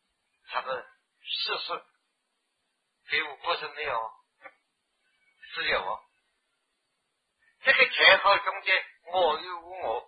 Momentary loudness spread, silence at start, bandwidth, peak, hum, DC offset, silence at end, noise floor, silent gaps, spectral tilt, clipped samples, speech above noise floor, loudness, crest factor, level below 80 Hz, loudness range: 19 LU; 0.5 s; 5 kHz; -4 dBFS; none; under 0.1%; 0.05 s; -79 dBFS; none; -4 dB/octave; under 0.1%; 52 dB; -26 LUFS; 24 dB; -66 dBFS; 12 LU